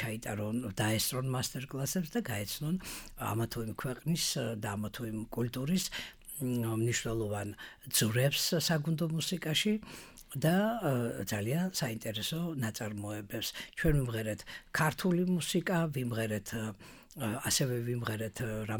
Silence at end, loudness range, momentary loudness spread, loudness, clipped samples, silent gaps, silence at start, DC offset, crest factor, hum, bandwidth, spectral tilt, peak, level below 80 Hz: 0 s; 4 LU; 9 LU; -34 LUFS; under 0.1%; none; 0 s; under 0.1%; 18 dB; none; 19.5 kHz; -4.5 dB/octave; -14 dBFS; -52 dBFS